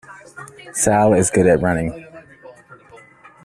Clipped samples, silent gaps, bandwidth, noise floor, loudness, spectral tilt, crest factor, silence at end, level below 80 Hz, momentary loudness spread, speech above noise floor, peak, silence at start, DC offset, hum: under 0.1%; none; 14.5 kHz; -46 dBFS; -16 LUFS; -5.5 dB/octave; 18 dB; 0.95 s; -46 dBFS; 23 LU; 30 dB; -2 dBFS; 0.1 s; under 0.1%; none